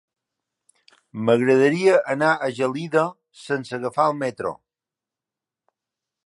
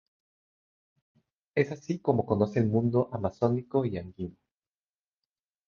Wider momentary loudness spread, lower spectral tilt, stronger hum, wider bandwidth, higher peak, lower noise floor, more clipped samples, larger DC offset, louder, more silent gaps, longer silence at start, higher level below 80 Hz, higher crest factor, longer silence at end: about the same, 12 LU vs 11 LU; second, -6 dB/octave vs -9 dB/octave; neither; first, 11.5 kHz vs 7 kHz; first, -4 dBFS vs -10 dBFS; about the same, -89 dBFS vs under -90 dBFS; neither; neither; first, -21 LUFS vs -29 LUFS; neither; second, 1.15 s vs 1.55 s; second, -70 dBFS vs -56 dBFS; about the same, 18 dB vs 22 dB; first, 1.7 s vs 1.4 s